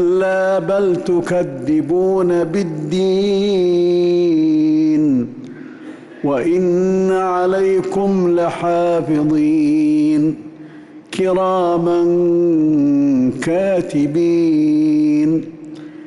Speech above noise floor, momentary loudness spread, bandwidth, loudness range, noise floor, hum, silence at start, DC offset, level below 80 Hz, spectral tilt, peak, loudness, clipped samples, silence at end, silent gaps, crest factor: 23 dB; 6 LU; 11.5 kHz; 2 LU; -37 dBFS; none; 0 s; under 0.1%; -54 dBFS; -7.5 dB/octave; -8 dBFS; -15 LUFS; under 0.1%; 0 s; none; 6 dB